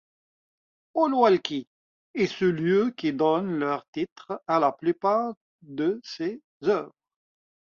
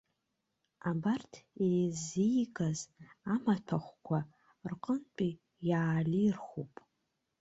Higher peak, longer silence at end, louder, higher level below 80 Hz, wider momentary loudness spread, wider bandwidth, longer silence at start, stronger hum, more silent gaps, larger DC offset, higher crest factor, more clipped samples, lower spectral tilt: first, -6 dBFS vs -18 dBFS; about the same, 0.85 s vs 0.75 s; first, -26 LUFS vs -35 LUFS; about the same, -70 dBFS vs -70 dBFS; about the same, 12 LU vs 14 LU; second, 7.2 kHz vs 8.2 kHz; about the same, 0.95 s vs 0.85 s; neither; first, 1.67-2.14 s, 3.88-3.93 s, 4.12-4.16 s, 5.37-5.59 s, 6.44-6.60 s vs none; neither; about the same, 20 dB vs 18 dB; neither; about the same, -6.5 dB/octave vs -6.5 dB/octave